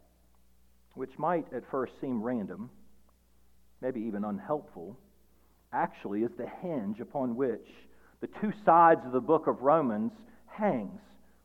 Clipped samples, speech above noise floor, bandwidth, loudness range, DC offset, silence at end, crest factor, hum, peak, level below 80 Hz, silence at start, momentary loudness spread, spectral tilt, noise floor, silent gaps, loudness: under 0.1%; 36 dB; 15 kHz; 10 LU; under 0.1%; 0.45 s; 22 dB; 60 Hz at -65 dBFS; -10 dBFS; -68 dBFS; 0.95 s; 19 LU; -9 dB/octave; -66 dBFS; none; -30 LUFS